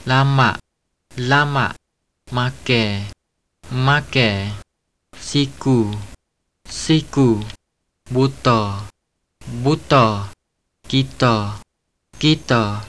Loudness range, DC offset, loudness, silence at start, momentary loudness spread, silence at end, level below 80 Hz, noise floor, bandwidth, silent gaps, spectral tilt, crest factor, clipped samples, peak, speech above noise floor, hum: 2 LU; 0.6%; -18 LUFS; 0 s; 17 LU; 0 s; -44 dBFS; -74 dBFS; 11 kHz; none; -5.5 dB/octave; 18 dB; under 0.1%; 0 dBFS; 56 dB; none